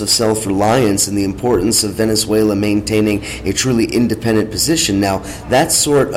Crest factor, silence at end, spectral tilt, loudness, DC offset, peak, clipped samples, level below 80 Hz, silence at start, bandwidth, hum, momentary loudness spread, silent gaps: 12 dB; 0 s; -4 dB/octave; -14 LUFS; under 0.1%; -2 dBFS; under 0.1%; -36 dBFS; 0 s; 16.5 kHz; none; 5 LU; none